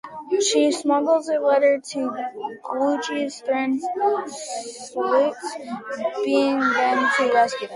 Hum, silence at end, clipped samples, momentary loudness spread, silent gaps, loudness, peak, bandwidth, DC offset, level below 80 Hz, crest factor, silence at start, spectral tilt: none; 0 s; under 0.1%; 13 LU; none; -22 LUFS; -6 dBFS; 11.5 kHz; under 0.1%; -72 dBFS; 14 dB; 0.05 s; -2.5 dB/octave